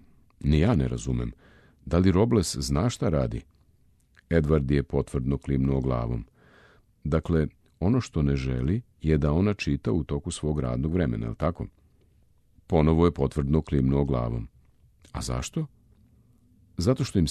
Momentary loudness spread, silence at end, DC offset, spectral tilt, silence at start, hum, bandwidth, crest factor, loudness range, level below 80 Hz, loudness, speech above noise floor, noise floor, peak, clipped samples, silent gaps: 11 LU; 0 s; under 0.1%; -7 dB/octave; 0.4 s; none; 13 kHz; 18 dB; 3 LU; -36 dBFS; -26 LUFS; 37 dB; -62 dBFS; -8 dBFS; under 0.1%; none